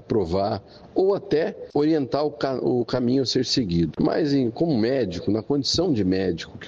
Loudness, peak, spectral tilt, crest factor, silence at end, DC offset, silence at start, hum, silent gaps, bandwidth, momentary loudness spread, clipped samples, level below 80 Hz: -23 LUFS; -8 dBFS; -6 dB/octave; 14 dB; 0 s; under 0.1%; 0.1 s; none; none; 8 kHz; 4 LU; under 0.1%; -50 dBFS